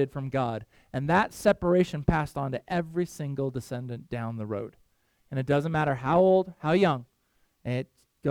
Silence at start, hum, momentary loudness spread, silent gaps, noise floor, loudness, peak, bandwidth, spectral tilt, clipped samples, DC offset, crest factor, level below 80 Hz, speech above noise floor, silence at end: 0 s; none; 13 LU; none; -70 dBFS; -28 LUFS; -8 dBFS; 17.5 kHz; -7 dB/octave; under 0.1%; under 0.1%; 20 dB; -48 dBFS; 43 dB; 0 s